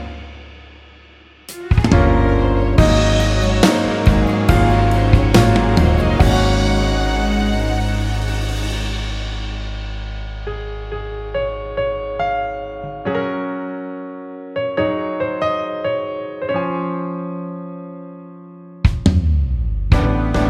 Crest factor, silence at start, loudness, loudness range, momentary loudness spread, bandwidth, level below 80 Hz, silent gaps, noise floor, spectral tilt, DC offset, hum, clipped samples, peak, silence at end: 16 dB; 0 s; -18 LUFS; 10 LU; 15 LU; 14 kHz; -22 dBFS; none; -45 dBFS; -6.5 dB/octave; under 0.1%; none; under 0.1%; 0 dBFS; 0 s